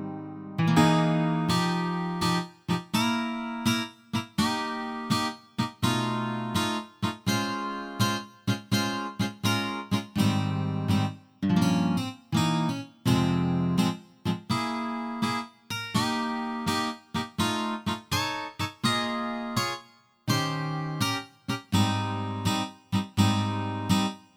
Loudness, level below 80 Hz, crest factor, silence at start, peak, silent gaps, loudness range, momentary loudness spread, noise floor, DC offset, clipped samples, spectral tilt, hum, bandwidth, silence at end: -28 LUFS; -58 dBFS; 20 dB; 0 s; -8 dBFS; none; 3 LU; 8 LU; -53 dBFS; under 0.1%; under 0.1%; -5 dB/octave; none; 18 kHz; 0.15 s